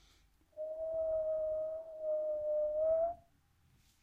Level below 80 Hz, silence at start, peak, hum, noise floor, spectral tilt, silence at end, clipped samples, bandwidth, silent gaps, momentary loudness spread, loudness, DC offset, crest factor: -66 dBFS; 0.55 s; -26 dBFS; none; -71 dBFS; -7 dB/octave; 0.8 s; under 0.1%; 3.9 kHz; none; 12 LU; -37 LUFS; under 0.1%; 12 dB